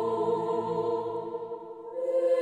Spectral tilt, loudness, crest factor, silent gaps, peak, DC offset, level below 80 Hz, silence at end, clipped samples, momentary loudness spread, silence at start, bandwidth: -7.5 dB/octave; -31 LUFS; 12 dB; none; -16 dBFS; under 0.1%; -74 dBFS; 0 s; under 0.1%; 11 LU; 0 s; 9.2 kHz